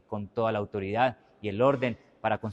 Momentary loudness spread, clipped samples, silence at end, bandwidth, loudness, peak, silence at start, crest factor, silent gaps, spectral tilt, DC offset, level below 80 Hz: 10 LU; under 0.1%; 0 s; 8 kHz; -29 LUFS; -10 dBFS; 0.1 s; 20 dB; none; -8 dB/octave; under 0.1%; -64 dBFS